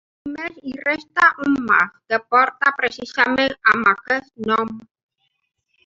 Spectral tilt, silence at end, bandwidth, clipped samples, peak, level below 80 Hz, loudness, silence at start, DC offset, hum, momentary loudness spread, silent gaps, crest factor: -4.5 dB/octave; 1.05 s; 7.8 kHz; under 0.1%; -2 dBFS; -60 dBFS; -19 LUFS; 0.25 s; under 0.1%; none; 14 LU; none; 18 dB